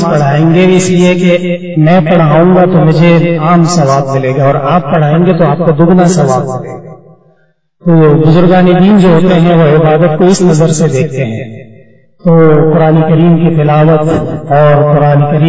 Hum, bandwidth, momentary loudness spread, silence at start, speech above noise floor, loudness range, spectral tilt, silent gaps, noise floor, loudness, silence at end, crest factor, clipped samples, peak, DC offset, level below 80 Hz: none; 8 kHz; 7 LU; 0 s; 46 dB; 3 LU; -7.5 dB/octave; none; -52 dBFS; -7 LUFS; 0 s; 6 dB; 1%; 0 dBFS; under 0.1%; -38 dBFS